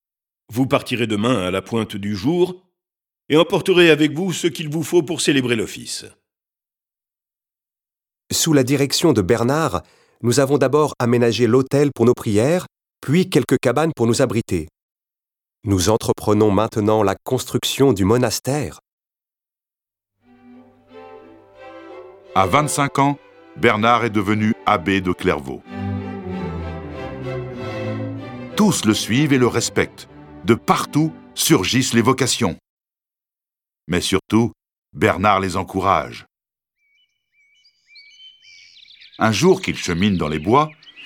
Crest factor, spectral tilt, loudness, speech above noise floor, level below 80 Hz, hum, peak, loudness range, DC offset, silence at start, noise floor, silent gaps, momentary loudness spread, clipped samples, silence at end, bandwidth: 20 dB; -5 dB/octave; -18 LUFS; over 72 dB; -48 dBFS; none; 0 dBFS; 7 LU; under 0.1%; 0.5 s; under -90 dBFS; 14.82-14.96 s, 18.92-18.98 s, 32.69-32.77 s, 34.78-34.82 s; 12 LU; under 0.1%; 0 s; 19 kHz